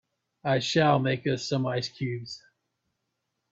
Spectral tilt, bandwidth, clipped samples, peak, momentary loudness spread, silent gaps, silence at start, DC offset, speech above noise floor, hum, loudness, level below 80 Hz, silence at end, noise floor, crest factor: -5.5 dB/octave; 7.8 kHz; under 0.1%; -10 dBFS; 14 LU; none; 0.45 s; under 0.1%; 54 dB; none; -27 LUFS; -66 dBFS; 1.15 s; -81 dBFS; 20 dB